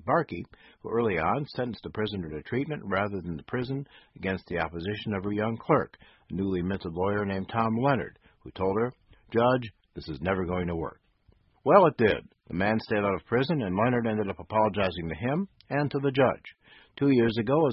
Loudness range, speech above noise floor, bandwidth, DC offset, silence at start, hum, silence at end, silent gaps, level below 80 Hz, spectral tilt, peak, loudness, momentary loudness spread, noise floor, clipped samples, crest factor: 6 LU; 36 dB; 5.8 kHz; under 0.1%; 0.05 s; none; 0 s; none; -52 dBFS; -11 dB/octave; -4 dBFS; -28 LUFS; 12 LU; -64 dBFS; under 0.1%; 24 dB